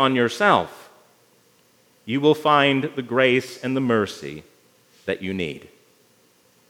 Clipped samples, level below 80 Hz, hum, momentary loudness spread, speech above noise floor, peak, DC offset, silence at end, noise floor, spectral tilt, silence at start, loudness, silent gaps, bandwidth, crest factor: under 0.1%; -68 dBFS; none; 18 LU; 38 dB; -2 dBFS; under 0.1%; 1.1 s; -59 dBFS; -5.5 dB/octave; 0 s; -21 LUFS; none; 17 kHz; 22 dB